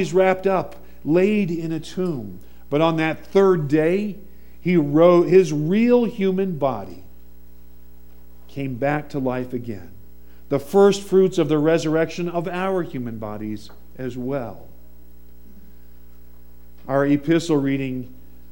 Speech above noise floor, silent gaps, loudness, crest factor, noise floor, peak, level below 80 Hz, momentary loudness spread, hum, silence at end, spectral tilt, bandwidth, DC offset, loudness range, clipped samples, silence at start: 28 dB; none; -20 LUFS; 18 dB; -48 dBFS; -2 dBFS; -50 dBFS; 16 LU; none; 0.4 s; -7 dB/octave; 16.5 kHz; 1%; 11 LU; under 0.1%; 0 s